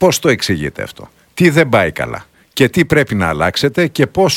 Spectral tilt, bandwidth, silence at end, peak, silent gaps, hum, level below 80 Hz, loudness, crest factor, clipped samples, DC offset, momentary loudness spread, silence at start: -5 dB/octave; 17 kHz; 0 s; 0 dBFS; none; none; -40 dBFS; -14 LUFS; 14 dB; 0.2%; under 0.1%; 15 LU; 0 s